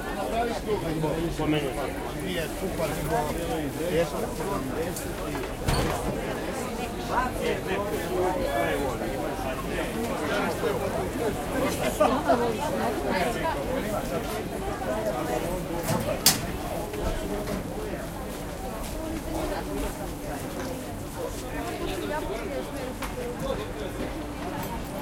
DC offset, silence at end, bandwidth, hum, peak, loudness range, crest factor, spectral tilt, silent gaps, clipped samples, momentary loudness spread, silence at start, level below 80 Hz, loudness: under 0.1%; 0 s; 16.5 kHz; none; -4 dBFS; 6 LU; 24 dB; -4.5 dB/octave; none; under 0.1%; 7 LU; 0 s; -40 dBFS; -29 LUFS